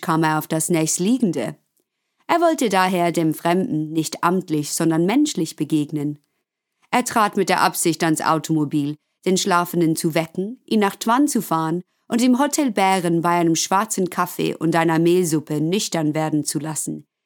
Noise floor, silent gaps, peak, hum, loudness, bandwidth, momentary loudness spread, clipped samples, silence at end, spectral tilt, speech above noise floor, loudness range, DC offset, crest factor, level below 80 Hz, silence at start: -76 dBFS; none; -2 dBFS; none; -20 LUFS; 19 kHz; 7 LU; under 0.1%; 0.25 s; -4.5 dB/octave; 57 dB; 2 LU; under 0.1%; 18 dB; -74 dBFS; 0 s